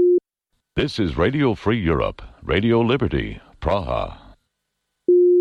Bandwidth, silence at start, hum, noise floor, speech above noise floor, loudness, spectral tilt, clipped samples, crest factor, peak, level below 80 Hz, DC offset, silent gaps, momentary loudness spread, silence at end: 6.8 kHz; 0 s; none; -77 dBFS; 56 dB; -21 LUFS; -8 dB/octave; under 0.1%; 12 dB; -8 dBFS; -36 dBFS; under 0.1%; none; 10 LU; 0 s